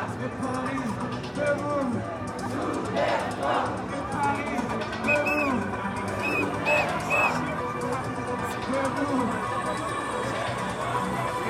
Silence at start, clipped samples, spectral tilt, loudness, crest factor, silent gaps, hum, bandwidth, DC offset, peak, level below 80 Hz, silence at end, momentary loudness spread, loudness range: 0 s; under 0.1%; -5.5 dB/octave; -27 LUFS; 16 dB; none; none; 16 kHz; under 0.1%; -12 dBFS; -52 dBFS; 0 s; 7 LU; 3 LU